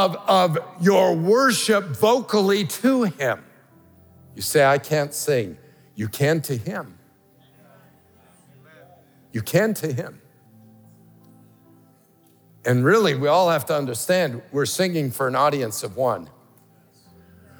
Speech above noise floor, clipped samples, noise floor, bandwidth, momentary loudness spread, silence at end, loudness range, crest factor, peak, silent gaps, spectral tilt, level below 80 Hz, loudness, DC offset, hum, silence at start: 36 dB; under 0.1%; -57 dBFS; over 20 kHz; 13 LU; 1.35 s; 9 LU; 18 dB; -4 dBFS; none; -5 dB/octave; -74 dBFS; -21 LUFS; under 0.1%; none; 0 s